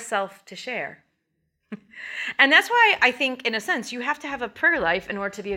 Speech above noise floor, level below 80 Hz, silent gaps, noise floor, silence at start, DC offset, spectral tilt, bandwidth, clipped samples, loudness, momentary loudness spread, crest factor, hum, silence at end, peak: 51 dB; -62 dBFS; none; -74 dBFS; 0 s; under 0.1%; -2.5 dB/octave; 17 kHz; under 0.1%; -21 LUFS; 20 LU; 20 dB; none; 0 s; -4 dBFS